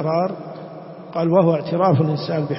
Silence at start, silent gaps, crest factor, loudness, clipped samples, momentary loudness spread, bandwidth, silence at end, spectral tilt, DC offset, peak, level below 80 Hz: 0 s; none; 16 dB; -19 LUFS; under 0.1%; 18 LU; 5.8 kHz; 0 s; -12 dB/octave; under 0.1%; -4 dBFS; -62 dBFS